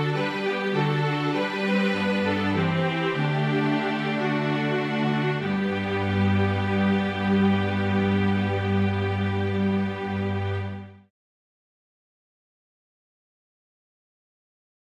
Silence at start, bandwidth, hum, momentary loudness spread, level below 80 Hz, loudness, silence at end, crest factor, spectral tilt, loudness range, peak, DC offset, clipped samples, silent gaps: 0 s; 9.2 kHz; none; 4 LU; -46 dBFS; -24 LUFS; 3.85 s; 14 dB; -7.5 dB/octave; 7 LU; -12 dBFS; under 0.1%; under 0.1%; none